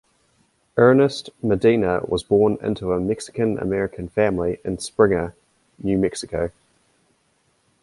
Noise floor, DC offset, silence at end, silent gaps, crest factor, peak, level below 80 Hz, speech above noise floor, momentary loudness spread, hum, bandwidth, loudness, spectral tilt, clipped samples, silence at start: -65 dBFS; under 0.1%; 1.35 s; none; 18 dB; -2 dBFS; -46 dBFS; 45 dB; 10 LU; none; 11.5 kHz; -21 LUFS; -6.5 dB/octave; under 0.1%; 0.75 s